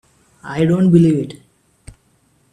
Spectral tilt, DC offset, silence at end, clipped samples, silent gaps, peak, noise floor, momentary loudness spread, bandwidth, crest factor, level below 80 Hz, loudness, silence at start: -8.5 dB/octave; under 0.1%; 1.2 s; under 0.1%; none; 0 dBFS; -58 dBFS; 18 LU; 10 kHz; 18 dB; -50 dBFS; -15 LUFS; 0.45 s